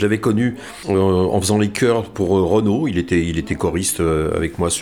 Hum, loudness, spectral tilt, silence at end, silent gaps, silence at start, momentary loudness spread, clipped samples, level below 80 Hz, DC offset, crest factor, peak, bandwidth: none; -18 LUFS; -5.5 dB/octave; 0 s; none; 0 s; 5 LU; under 0.1%; -38 dBFS; 0.2%; 14 dB; -4 dBFS; 18.5 kHz